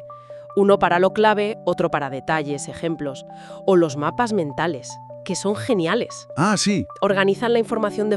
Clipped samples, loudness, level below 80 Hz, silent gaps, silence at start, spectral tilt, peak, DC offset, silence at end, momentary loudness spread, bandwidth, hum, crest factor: under 0.1%; -21 LUFS; -56 dBFS; none; 0 s; -5 dB/octave; -2 dBFS; under 0.1%; 0 s; 13 LU; 12 kHz; none; 18 dB